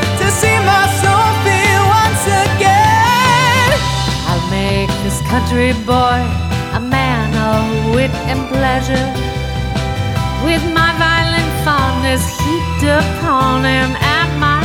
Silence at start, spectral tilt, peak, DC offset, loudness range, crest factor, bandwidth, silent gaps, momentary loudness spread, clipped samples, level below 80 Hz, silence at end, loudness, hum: 0 s; -4.5 dB/octave; 0 dBFS; under 0.1%; 5 LU; 12 dB; 16.5 kHz; none; 7 LU; under 0.1%; -26 dBFS; 0 s; -13 LUFS; none